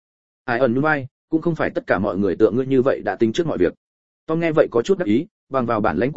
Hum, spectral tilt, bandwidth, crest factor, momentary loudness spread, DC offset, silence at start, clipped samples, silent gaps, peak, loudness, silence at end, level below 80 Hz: none; -7.5 dB/octave; 7.8 kHz; 18 dB; 7 LU; 0.8%; 0.45 s; under 0.1%; 1.11-1.28 s, 3.77-4.27 s, 5.31-5.47 s; -2 dBFS; -20 LUFS; 0 s; -50 dBFS